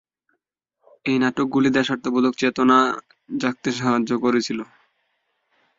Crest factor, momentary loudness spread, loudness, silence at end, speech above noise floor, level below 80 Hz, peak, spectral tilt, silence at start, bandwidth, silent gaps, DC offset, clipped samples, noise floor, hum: 20 dB; 14 LU; -21 LUFS; 1.15 s; 56 dB; -62 dBFS; -2 dBFS; -5 dB/octave; 1.05 s; 7.8 kHz; none; under 0.1%; under 0.1%; -76 dBFS; none